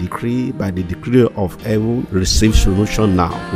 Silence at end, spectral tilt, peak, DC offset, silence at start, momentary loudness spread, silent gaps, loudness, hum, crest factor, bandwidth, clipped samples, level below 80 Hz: 0 s; -5.5 dB/octave; 0 dBFS; under 0.1%; 0 s; 8 LU; none; -16 LUFS; none; 16 dB; 16 kHz; under 0.1%; -22 dBFS